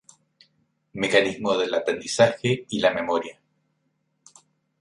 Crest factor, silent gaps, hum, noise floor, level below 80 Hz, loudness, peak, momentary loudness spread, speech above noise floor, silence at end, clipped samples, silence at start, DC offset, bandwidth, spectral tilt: 22 dB; none; none; -72 dBFS; -64 dBFS; -23 LUFS; -4 dBFS; 8 LU; 50 dB; 1.5 s; under 0.1%; 0.95 s; under 0.1%; 11.5 kHz; -4 dB/octave